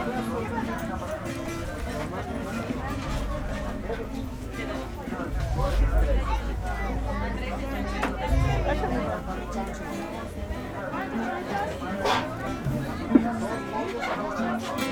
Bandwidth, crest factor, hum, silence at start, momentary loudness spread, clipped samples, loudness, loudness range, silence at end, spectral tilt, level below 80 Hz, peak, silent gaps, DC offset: 19 kHz; 24 dB; none; 0 s; 8 LU; under 0.1%; -29 LUFS; 5 LU; 0 s; -6 dB/octave; -32 dBFS; -4 dBFS; none; under 0.1%